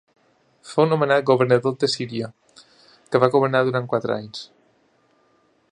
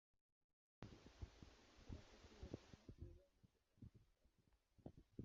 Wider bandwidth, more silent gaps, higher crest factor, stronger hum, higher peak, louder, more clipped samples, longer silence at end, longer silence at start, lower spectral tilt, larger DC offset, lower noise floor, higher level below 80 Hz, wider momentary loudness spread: first, 10.5 kHz vs 7.4 kHz; neither; about the same, 22 dB vs 26 dB; neither; first, 0 dBFS vs -38 dBFS; first, -20 LUFS vs -63 LUFS; neither; first, 1.25 s vs 0 s; second, 0.65 s vs 0.8 s; about the same, -6 dB/octave vs -6.5 dB/octave; neither; second, -62 dBFS vs -81 dBFS; about the same, -68 dBFS vs -68 dBFS; first, 13 LU vs 8 LU